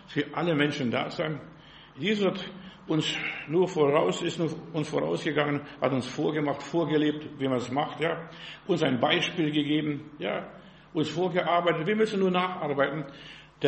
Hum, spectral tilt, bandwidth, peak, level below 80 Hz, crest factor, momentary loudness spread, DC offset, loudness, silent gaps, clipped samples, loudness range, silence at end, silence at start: none; -5.5 dB/octave; 8.4 kHz; -8 dBFS; -64 dBFS; 20 dB; 11 LU; under 0.1%; -28 LUFS; none; under 0.1%; 2 LU; 0 s; 0.1 s